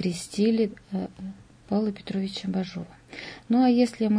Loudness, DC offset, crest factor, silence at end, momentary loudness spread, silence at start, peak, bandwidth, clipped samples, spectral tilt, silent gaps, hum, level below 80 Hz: -26 LUFS; under 0.1%; 16 dB; 0 s; 18 LU; 0 s; -10 dBFS; 10.5 kHz; under 0.1%; -6.5 dB/octave; none; none; -60 dBFS